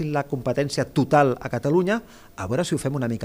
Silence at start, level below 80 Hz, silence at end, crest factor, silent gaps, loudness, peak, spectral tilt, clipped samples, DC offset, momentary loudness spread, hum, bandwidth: 0 s; -52 dBFS; 0 s; 18 dB; none; -23 LUFS; -4 dBFS; -6 dB/octave; under 0.1%; under 0.1%; 9 LU; none; 16 kHz